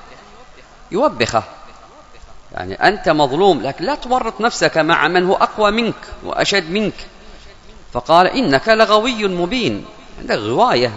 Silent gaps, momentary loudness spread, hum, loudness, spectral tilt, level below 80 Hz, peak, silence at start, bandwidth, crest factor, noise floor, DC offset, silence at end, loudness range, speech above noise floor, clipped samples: none; 14 LU; none; -16 LUFS; -4.5 dB/octave; -40 dBFS; 0 dBFS; 0 s; 11 kHz; 16 dB; -41 dBFS; under 0.1%; 0 s; 3 LU; 25 dB; under 0.1%